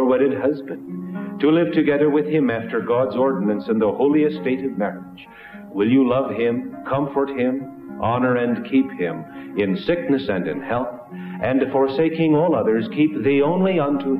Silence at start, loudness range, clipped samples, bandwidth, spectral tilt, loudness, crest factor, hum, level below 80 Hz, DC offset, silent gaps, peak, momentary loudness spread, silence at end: 0 s; 3 LU; under 0.1%; 5.2 kHz; -9.5 dB/octave; -20 LUFS; 14 dB; none; -54 dBFS; under 0.1%; none; -6 dBFS; 13 LU; 0 s